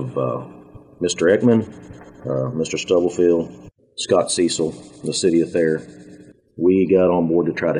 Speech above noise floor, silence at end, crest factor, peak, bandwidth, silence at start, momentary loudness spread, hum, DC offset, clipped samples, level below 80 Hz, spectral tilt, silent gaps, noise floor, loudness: 26 dB; 0 s; 16 dB; -4 dBFS; 10.5 kHz; 0 s; 15 LU; none; under 0.1%; under 0.1%; -56 dBFS; -5 dB/octave; none; -45 dBFS; -19 LUFS